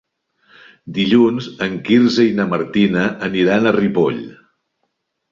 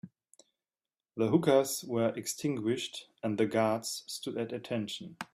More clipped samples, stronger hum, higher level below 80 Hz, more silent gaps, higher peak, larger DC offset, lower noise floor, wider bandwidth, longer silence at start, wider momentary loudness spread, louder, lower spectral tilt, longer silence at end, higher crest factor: neither; neither; first, -54 dBFS vs -74 dBFS; neither; first, -2 dBFS vs -12 dBFS; neither; second, -71 dBFS vs under -90 dBFS; second, 7.4 kHz vs 15.5 kHz; first, 0.85 s vs 0.05 s; about the same, 9 LU vs 11 LU; first, -16 LUFS vs -32 LUFS; first, -6.5 dB/octave vs -5 dB/octave; first, 1 s vs 0.1 s; about the same, 16 dB vs 20 dB